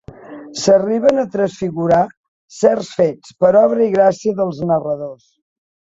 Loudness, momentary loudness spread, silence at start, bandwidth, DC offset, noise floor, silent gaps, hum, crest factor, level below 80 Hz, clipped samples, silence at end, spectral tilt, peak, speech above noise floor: -16 LUFS; 12 LU; 0.2 s; 8 kHz; under 0.1%; -35 dBFS; 2.17-2.48 s; none; 14 dB; -54 dBFS; under 0.1%; 0.8 s; -6 dB/octave; -2 dBFS; 20 dB